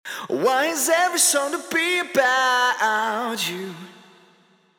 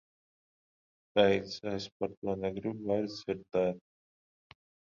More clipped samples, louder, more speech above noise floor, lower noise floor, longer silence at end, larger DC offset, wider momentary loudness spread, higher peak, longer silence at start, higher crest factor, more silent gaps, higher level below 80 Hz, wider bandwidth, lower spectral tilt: neither; first, -20 LUFS vs -33 LUFS; second, 37 dB vs over 58 dB; second, -58 dBFS vs under -90 dBFS; second, 0.9 s vs 1.15 s; neither; about the same, 10 LU vs 11 LU; first, -4 dBFS vs -10 dBFS; second, 0.05 s vs 1.15 s; second, 18 dB vs 24 dB; second, none vs 1.92-2.00 s, 2.17-2.22 s; second, -76 dBFS vs -64 dBFS; first, over 20 kHz vs 7.4 kHz; second, -1 dB/octave vs -6 dB/octave